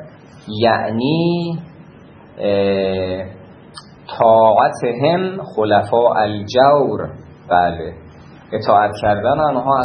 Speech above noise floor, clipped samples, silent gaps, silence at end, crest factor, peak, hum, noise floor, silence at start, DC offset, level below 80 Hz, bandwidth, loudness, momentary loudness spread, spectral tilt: 26 dB; under 0.1%; none; 0 s; 16 dB; 0 dBFS; none; -41 dBFS; 0 s; under 0.1%; -50 dBFS; 10.5 kHz; -16 LUFS; 15 LU; -7 dB/octave